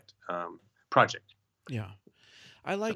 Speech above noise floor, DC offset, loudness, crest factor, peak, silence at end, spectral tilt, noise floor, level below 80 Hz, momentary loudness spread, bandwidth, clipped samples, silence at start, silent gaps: 27 dB; under 0.1%; -31 LUFS; 26 dB; -6 dBFS; 0 s; -5 dB/octave; -57 dBFS; -76 dBFS; 17 LU; 13 kHz; under 0.1%; 0.25 s; none